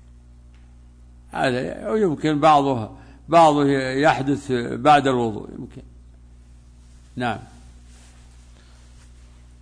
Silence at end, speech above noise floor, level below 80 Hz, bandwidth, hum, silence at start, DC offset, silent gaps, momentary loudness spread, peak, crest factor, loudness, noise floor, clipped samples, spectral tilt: 2.15 s; 28 dB; -48 dBFS; 10.5 kHz; 60 Hz at -45 dBFS; 1.35 s; under 0.1%; none; 18 LU; -6 dBFS; 18 dB; -19 LUFS; -47 dBFS; under 0.1%; -6 dB/octave